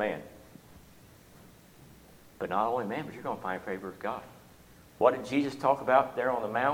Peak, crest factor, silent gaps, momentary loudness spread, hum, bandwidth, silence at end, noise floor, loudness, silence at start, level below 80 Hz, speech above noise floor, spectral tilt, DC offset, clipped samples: -10 dBFS; 22 dB; none; 15 LU; none; 18.5 kHz; 0 s; -56 dBFS; -30 LUFS; 0 s; -64 dBFS; 26 dB; -6 dB/octave; under 0.1%; under 0.1%